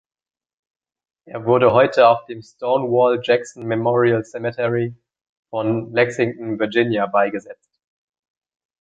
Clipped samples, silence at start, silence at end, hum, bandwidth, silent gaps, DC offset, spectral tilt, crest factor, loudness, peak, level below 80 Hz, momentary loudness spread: under 0.1%; 1.25 s; 1.25 s; none; 8 kHz; 5.29-5.43 s; under 0.1%; -6.5 dB/octave; 18 dB; -19 LUFS; -2 dBFS; -60 dBFS; 13 LU